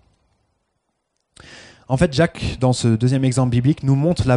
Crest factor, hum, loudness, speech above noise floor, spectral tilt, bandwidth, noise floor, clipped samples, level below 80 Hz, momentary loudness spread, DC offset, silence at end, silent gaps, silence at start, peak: 16 dB; none; -18 LUFS; 56 dB; -6.5 dB/octave; 10.5 kHz; -72 dBFS; under 0.1%; -40 dBFS; 3 LU; under 0.1%; 0 s; none; 1.5 s; -4 dBFS